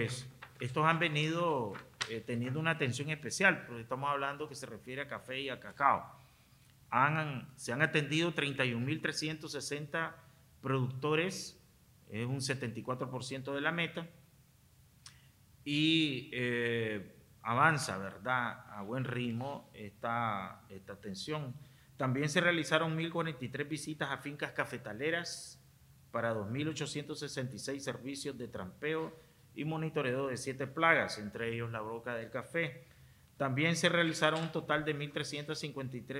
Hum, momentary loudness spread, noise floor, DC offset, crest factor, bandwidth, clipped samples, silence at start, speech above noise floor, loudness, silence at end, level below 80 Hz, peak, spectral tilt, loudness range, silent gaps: none; 14 LU; -64 dBFS; under 0.1%; 24 dB; 16 kHz; under 0.1%; 0 s; 29 dB; -35 LUFS; 0 s; -72 dBFS; -12 dBFS; -4.5 dB/octave; 6 LU; none